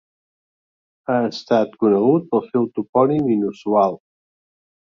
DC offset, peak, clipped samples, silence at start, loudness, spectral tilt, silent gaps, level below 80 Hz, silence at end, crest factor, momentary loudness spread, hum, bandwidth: under 0.1%; -2 dBFS; under 0.1%; 1.1 s; -19 LUFS; -8 dB/octave; 2.89-2.93 s; -64 dBFS; 1 s; 18 dB; 5 LU; none; 7.2 kHz